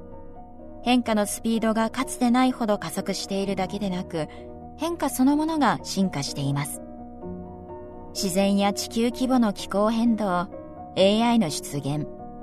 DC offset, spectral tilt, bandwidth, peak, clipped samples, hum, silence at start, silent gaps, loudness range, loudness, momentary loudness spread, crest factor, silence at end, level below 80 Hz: under 0.1%; -5 dB/octave; 13.5 kHz; -6 dBFS; under 0.1%; none; 0 s; none; 3 LU; -24 LUFS; 18 LU; 18 dB; 0 s; -46 dBFS